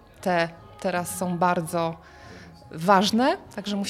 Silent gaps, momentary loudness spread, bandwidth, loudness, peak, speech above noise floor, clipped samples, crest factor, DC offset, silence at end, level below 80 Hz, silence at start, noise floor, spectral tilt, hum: none; 20 LU; 16 kHz; -24 LUFS; -4 dBFS; 21 dB; under 0.1%; 20 dB; under 0.1%; 0 s; -58 dBFS; 0.2 s; -45 dBFS; -5 dB/octave; none